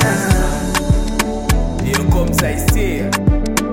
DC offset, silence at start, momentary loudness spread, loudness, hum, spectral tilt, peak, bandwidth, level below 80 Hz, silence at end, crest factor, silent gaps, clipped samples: under 0.1%; 0 s; 3 LU; -16 LUFS; none; -5 dB/octave; 0 dBFS; 17 kHz; -20 dBFS; 0 s; 14 dB; none; under 0.1%